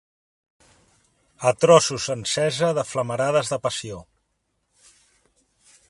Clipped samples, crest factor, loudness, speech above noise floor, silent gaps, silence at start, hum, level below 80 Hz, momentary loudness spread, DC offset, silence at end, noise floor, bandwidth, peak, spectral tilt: under 0.1%; 24 dB; -21 LUFS; 52 dB; none; 1.4 s; none; -60 dBFS; 13 LU; under 0.1%; 1.9 s; -73 dBFS; 11.5 kHz; 0 dBFS; -4 dB/octave